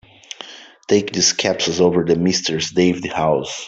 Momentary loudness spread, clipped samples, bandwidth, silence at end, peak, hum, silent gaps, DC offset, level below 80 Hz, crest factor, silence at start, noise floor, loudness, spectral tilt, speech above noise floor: 18 LU; under 0.1%; 8.2 kHz; 0 s; -2 dBFS; none; none; under 0.1%; -54 dBFS; 16 dB; 0.4 s; -39 dBFS; -17 LUFS; -3.5 dB/octave; 21 dB